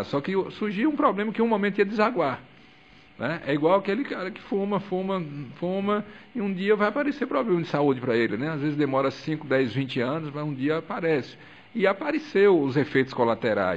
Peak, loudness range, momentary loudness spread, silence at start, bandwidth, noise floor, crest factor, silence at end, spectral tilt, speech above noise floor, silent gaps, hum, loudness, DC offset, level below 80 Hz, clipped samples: -6 dBFS; 3 LU; 8 LU; 0 s; 7.8 kHz; -53 dBFS; 18 dB; 0 s; -7.5 dB/octave; 28 dB; none; none; -25 LUFS; 0.1%; -66 dBFS; under 0.1%